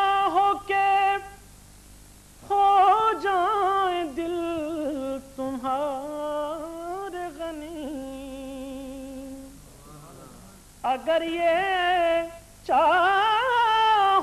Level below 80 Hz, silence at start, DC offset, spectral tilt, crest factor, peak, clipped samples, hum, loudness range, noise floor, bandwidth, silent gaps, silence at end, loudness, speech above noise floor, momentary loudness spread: -54 dBFS; 0 s; under 0.1%; -3.5 dB/octave; 14 dB; -10 dBFS; under 0.1%; 50 Hz at -55 dBFS; 13 LU; -49 dBFS; 13.5 kHz; none; 0 s; -24 LUFS; 27 dB; 17 LU